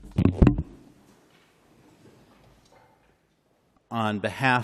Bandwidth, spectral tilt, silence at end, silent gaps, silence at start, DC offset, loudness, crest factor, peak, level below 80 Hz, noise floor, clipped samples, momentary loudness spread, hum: 13 kHz; -7.5 dB/octave; 0 s; none; 0.05 s; under 0.1%; -24 LUFS; 26 dB; -2 dBFS; -36 dBFS; -67 dBFS; under 0.1%; 14 LU; none